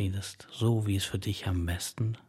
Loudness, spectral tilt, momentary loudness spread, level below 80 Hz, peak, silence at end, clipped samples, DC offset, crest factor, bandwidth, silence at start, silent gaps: -32 LUFS; -5.5 dB/octave; 6 LU; -54 dBFS; -14 dBFS; 0.1 s; under 0.1%; under 0.1%; 16 dB; 15.5 kHz; 0 s; none